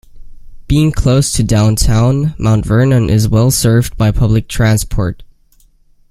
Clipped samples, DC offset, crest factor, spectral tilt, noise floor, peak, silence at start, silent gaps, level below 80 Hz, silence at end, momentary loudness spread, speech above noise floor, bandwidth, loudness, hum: under 0.1%; under 0.1%; 12 dB; -6 dB/octave; -48 dBFS; 0 dBFS; 0.15 s; none; -24 dBFS; 0.85 s; 4 LU; 38 dB; 15.5 kHz; -12 LUFS; none